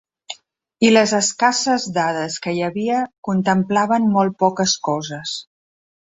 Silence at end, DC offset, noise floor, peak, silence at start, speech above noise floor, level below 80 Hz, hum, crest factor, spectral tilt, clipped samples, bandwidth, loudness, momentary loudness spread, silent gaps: 0.6 s; under 0.1%; -50 dBFS; -2 dBFS; 0.3 s; 31 dB; -62 dBFS; none; 18 dB; -4 dB/octave; under 0.1%; 8.2 kHz; -18 LUFS; 13 LU; 3.18-3.23 s